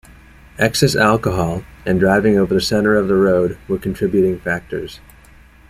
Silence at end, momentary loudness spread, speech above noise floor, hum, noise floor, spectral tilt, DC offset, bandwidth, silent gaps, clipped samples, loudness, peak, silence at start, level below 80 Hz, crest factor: 0.75 s; 9 LU; 29 dB; none; -45 dBFS; -5.5 dB/octave; under 0.1%; 15.5 kHz; none; under 0.1%; -16 LUFS; -2 dBFS; 0.6 s; -40 dBFS; 16 dB